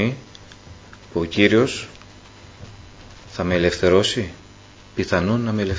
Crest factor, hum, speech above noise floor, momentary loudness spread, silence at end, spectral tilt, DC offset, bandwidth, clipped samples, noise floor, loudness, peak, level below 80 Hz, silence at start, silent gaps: 22 dB; 50 Hz at -45 dBFS; 26 dB; 25 LU; 0 s; -5.5 dB/octave; under 0.1%; 8 kHz; under 0.1%; -45 dBFS; -20 LUFS; 0 dBFS; -42 dBFS; 0 s; none